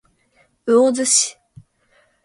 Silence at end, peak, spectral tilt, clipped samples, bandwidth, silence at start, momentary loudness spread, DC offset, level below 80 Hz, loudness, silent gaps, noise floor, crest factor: 0.95 s; -4 dBFS; -1.5 dB/octave; under 0.1%; 11.5 kHz; 0.65 s; 10 LU; under 0.1%; -66 dBFS; -16 LUFS; none; -60 dBFS; 18 dB